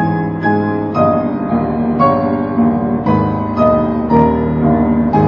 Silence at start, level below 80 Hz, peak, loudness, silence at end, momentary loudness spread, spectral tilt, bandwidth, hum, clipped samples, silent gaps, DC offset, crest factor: 0 s; -32 dBFS; 0 dBFS; -14 LUFS; 0 s; 4 LU; -10.5 dB/octave; 5.4 kHz; none; under 0.1%; none; under 0.1%; 14 dB